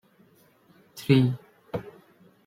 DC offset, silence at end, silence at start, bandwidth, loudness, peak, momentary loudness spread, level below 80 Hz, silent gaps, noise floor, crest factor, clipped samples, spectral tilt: under 0.1%; 0.55 s; 0.95 s; 15.5 kHz; -26 LUFS; -6 dBFS; 24 LU; -62 dBFS; none; -60 dBFS; 22 dB; under 0.1%; -7.5 dB/octave